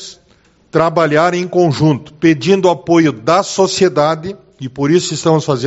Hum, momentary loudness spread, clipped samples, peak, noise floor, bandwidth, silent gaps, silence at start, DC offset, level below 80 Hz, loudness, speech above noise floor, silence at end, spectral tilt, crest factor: none; 8 LU; under 0.1%; 0 dBFS; -51 dBFS; 8.2 kHz; none; 0 s; under 0.1%; -52 dBFS; -13 LUFS; 38 dB; 0 s; -5.5 dB/octave; 14 dB